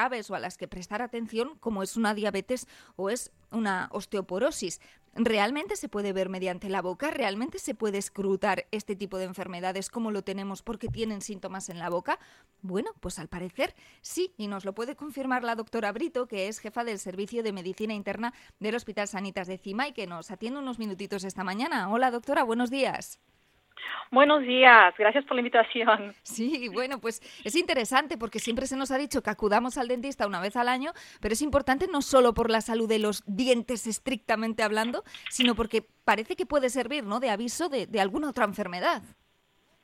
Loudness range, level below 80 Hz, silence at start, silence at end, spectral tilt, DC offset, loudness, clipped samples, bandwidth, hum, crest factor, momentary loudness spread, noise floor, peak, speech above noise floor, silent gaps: 12 LU; -56 dBFS; 0 s; 0.75 s; -3.5 dB/octave; under 0.1%; -28 LUFS; under 0.1%; 16.5 kHz; none; 26 dB; 12 LU; -68 dBFS; -2 dBFS; 40 dB; none